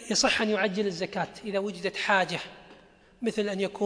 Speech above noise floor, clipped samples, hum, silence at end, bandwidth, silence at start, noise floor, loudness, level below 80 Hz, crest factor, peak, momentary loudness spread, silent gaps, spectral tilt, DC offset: 27 dB; under 0.1%; none; 0 s; 10.5 kHz; 0 s; -56 dBFS; -28 LUFS; -62 dBFS; 20 dB; -10 dBFS; 10 LU; none; -3 dB/octave; under 0.1%